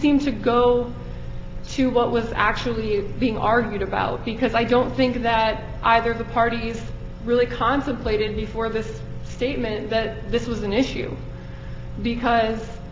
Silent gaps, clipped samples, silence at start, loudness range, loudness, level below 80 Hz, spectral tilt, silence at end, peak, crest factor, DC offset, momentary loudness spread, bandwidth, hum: none; under 0.1%; 0 s; 4 LU; -22 LUFS; -36 dBFS; -6.5 dB/octave; 0 s; -2 dBFS; 20 dB; under 0.1%; 15 LU; 7.6 kHz; none